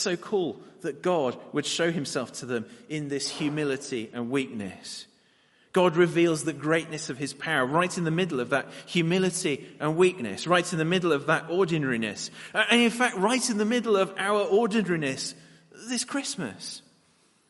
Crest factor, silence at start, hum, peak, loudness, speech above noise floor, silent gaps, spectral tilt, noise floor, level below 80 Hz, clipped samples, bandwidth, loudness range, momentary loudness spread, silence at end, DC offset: 20 dB; 0 s; none; -6 dBFS; -27 LUFS; 38 dB; none; -4.5 dB/octave; -64 dBFS; -70 dBFS; under 0.1%; 11.5 kHz; 5 LU; 11 LU; 0.7 s; under 0.1%